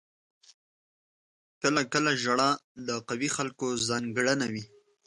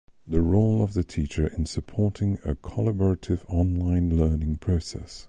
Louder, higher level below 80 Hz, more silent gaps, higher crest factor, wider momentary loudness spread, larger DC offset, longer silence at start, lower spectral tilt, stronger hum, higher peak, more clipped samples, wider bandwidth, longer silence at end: about the same, -28 LUFS vs -26 LUFS; second, -70 dBFS vs -32 dBFS; first, 2.64-2.75 s vs none; about the same, 20 dB vs 16 dB; about the same, 8 LU vs 7 LU; neither; first, 1.6 s vs 0.25 s; second, -3.5 dB/octave vs -8 dB/octave; neither; about the same, -10 dBFS vs -8 dBFS; neither; first, 11.5 kHz vs 9.4 kHz; first, 0.4 s vs 0 s